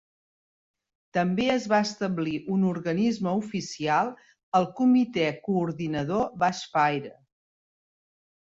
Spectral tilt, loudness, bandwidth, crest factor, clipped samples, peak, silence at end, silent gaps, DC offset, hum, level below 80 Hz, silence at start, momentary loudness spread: -6 dB/octave; -26 LUFS; 7.8 kHz; 18 dB; under 0.1%; -10 dBFS; 1.35 s; 4.43-4.52 s; under 0.1%; none; -64 dBFS; 1.15 s; 7 LU